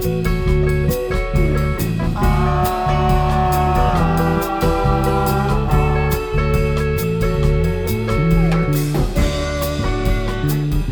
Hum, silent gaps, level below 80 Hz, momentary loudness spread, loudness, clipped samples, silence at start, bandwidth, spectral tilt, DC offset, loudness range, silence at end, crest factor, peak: none; none; -22 dBFS; 4 LU; -18 LUFS; under 0.1%; 0 s; over 20 kHz; -7 dB/octave; under 0.1%; 1 LU; 0 s; 14 dB; -2 dBFS